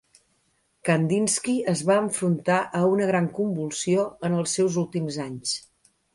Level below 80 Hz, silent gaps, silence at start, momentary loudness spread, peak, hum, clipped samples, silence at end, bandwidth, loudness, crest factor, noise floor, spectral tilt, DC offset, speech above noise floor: -66 dBFS; none; 0.85 s; 7 LU; -8 dBFS; none; under 0.1%; 0.55 s; 11.5 kHz; -24 LUFS; 16 dB; -69 dBFS; -5 dB/octave; under 0.1%; 45 dB